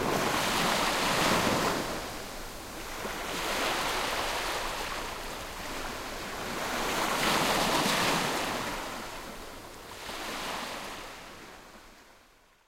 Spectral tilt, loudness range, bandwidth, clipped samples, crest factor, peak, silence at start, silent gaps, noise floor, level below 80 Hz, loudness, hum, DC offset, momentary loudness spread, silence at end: -2.5 dB/octave; 9 LU; 16 kHz; under 0.1%; 18 dB; -14 dBFS; 0 s; none; -61 dBFS; -48 dBFS; -30 LUFS; none; under 0.1%; 16 LU; 0.5 s